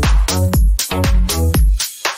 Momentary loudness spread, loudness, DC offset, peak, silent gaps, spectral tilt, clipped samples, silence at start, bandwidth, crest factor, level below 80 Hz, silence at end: 2 LU; -16 LUFS; under 0.1%; -2 dBFS; none; -4 dB/octave; under 0.1%; 0 s; 16.5 kHz; 10 dB; -16 dBFS; 0 s